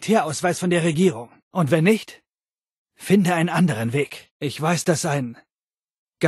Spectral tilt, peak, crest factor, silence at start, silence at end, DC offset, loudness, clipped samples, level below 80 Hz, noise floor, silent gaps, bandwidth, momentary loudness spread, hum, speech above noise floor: -5.5 dB/octave; -4 dBFS; 18 dB; 0 s; 0 s; under 0.1%; -21 LUFS; under 0.1%; -64 dBFS; under -90 dBFS; 1.43-1.51 s, 2.60-2.86 s, 4.31-4.40 s, 5.61-5.69 s, 5.84-6.07 s; 12.5 kHz; 12 LU; none; over 69 dB